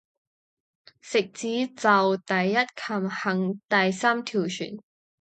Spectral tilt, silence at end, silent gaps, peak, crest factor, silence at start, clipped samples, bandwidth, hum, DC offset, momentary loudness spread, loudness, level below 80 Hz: -5 dB/octave; 0.4 s; 3.64-3.68 s; -6 dBFS; 20 dB; 1.05 s; under 0.1%; 9 kHz; none; under 0.1%; 8 LU; -25 LUFS; -76 dBFS